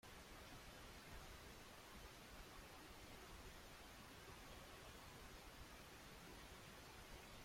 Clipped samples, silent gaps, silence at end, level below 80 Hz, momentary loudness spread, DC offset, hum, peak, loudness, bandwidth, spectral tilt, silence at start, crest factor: under 0.1%; none; 0 s; -66 dBFS; 1 LU; under 0.1%; none; -46 dBFS; -59 LUFS; 16.5 kHz; -3.5 dB/octave; 0.05 s; 14 dB